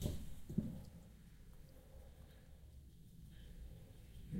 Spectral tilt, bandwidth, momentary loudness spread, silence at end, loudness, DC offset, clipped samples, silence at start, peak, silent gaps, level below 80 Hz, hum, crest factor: -7 dB/octave; 16 kHz; 17 LU; 0 s; -53 LUFS; under 0.1%; under 0.1%; 0 s; -24 dBFS; none; -56 dBFS; none; 24 dB